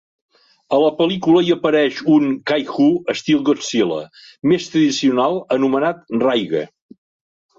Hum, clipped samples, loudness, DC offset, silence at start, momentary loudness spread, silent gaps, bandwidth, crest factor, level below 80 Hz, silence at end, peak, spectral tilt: none; under 0.1%; -17 LUFS; under 0.1%; 0.7 s; 6 LU; none; 7.8 kHz; 14 dB; -62 dBFS; 0.9 s; -2 dBFS; -5.5 dB/octave